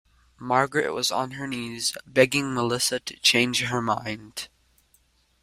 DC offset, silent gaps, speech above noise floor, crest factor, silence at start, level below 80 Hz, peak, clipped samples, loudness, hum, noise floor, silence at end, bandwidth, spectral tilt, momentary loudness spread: under 0.1%; none; 39 dB; 24 dB; 0.4 s; -60 dBFS; -2 dBFS; under 0.1%; -24 LUFS; none; -64 dBFS; 0.95 s; 16 kHz; -3 dB/octave; 14 LU